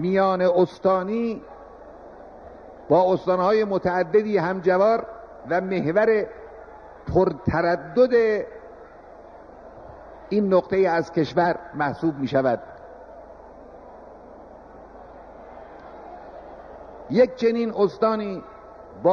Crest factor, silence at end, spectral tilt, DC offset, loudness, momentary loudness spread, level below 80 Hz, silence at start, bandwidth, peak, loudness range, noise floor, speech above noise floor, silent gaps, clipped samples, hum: 18 dB; 0 s; -8 dB/octave; under 0.1%; -22 LUFS; 24 LU; -52 dBFS; 0 s; 6.8 kHz; -6 dBFS; 15 LU; -45 dBFS; 24 dB; none; under 0.1%; none